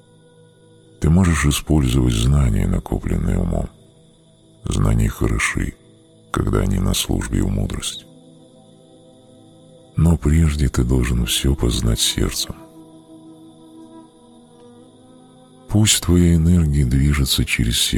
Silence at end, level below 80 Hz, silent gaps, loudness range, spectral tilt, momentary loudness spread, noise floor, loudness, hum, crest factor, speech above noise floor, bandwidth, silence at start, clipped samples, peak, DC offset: 0 s; -26 dBFS; none; 6 LU; -5 dB/octave; 11 LU; -51 dBFS; -18 LUFS; none; 18 dB; 34 dB; 19 kHz; 1 s; under 0.1%; -2 dBFS; under 0.1%